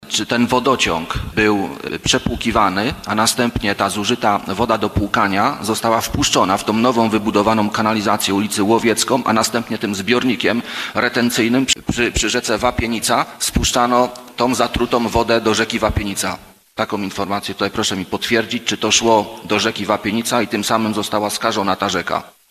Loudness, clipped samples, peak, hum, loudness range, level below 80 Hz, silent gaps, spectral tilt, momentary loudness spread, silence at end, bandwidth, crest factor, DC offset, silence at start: -17 LUFS; under 0.1%; 0 dBFS; none; 2 LU; -36 dBFS; none; -3.5 dB/octave; 6 LU; 0.2 s; 15 kHz; 18 dB; under 0.1%; 0 s